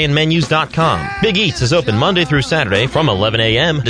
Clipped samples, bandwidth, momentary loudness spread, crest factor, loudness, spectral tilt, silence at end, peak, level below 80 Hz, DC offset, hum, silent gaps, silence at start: under 0.1%; 10 kHz; 2 LU; 14 dB; -14 LUFS; -5 dB/octave; 0 s; 0 dBFS; -36 dBFS; under 0.1%; none; none; 0 s